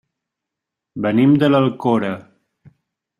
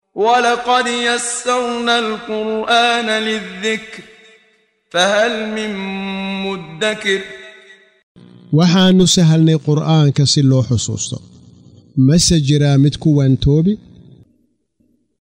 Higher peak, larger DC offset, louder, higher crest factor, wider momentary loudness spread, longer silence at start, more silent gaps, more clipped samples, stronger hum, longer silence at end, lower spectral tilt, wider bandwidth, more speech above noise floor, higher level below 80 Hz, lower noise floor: about the same, -2 dBFS vs 0 dBFS; neither; about the same, -17 LUFS vs -15 LUFS; about the same, 18 dB vs 16 dB; first, 16 LU vs 12 LU; first, 0.95 s vs 0.15 s; second, none vs 8.03-8.15 s; neither; neither; second, 1 s vs 1.45 s; first, -8.5 dB/octave vs -5 dB/octave; second, 6.8 kHz vs 15.5 kHz; first, 68 dB vs 46 dB; second, -60 dBFS vs -40 dBFS; first, -83 dBFS vs -61 dBFS